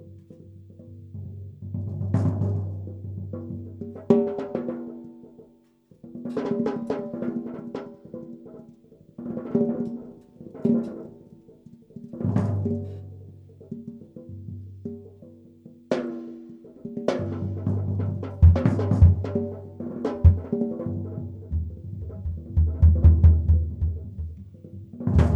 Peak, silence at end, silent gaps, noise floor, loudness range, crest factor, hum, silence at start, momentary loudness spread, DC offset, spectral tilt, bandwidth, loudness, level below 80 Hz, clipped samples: -4 dBFS; 0 s; none; -57 dBFS; 10 LU; 22 dB; none; 0 s; 24 LU; under 0.1%; -10 dB/octave; 5.2 kHz; -25 LUFS; -32 dBFS; under 0.1%